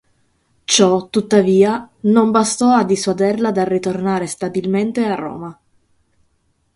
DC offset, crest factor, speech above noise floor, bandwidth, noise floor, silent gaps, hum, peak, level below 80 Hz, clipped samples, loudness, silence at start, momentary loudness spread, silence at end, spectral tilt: under 0.1%; 16 dB; 48 dB; 11.5 kHz; -63 dBFS; none; none; 0 dBFS; -58 dBFS; under 0.1%; -16 LUFS; 0.7 s; 9 LU; 1.25 s; -4.5 dB/octave